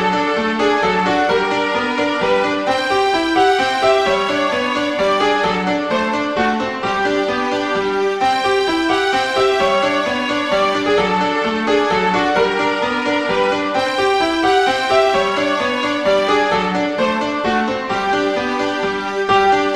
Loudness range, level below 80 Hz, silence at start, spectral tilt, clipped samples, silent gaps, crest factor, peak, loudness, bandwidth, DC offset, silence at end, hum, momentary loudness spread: 2 LU; -48 dBFS; 0 s; -4 dB/octave; under 0.1%; none; 14 dB; -2 dBFS; -16 LUFS; 13.5 kHz; 0.2%; 0 s; none; 4 LU